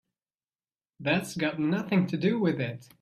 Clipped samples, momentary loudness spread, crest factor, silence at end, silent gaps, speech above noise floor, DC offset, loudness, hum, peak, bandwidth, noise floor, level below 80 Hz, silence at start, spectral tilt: under 0.1%; 7 LU; 16 dB; 0.2 s; none; over 62 dB; under 0.1%; -28 LUFS; none; -12 dBFS; 14 kHz; under -90 dBFS; -68 dBFS; 1 s; -6.5 dB/octave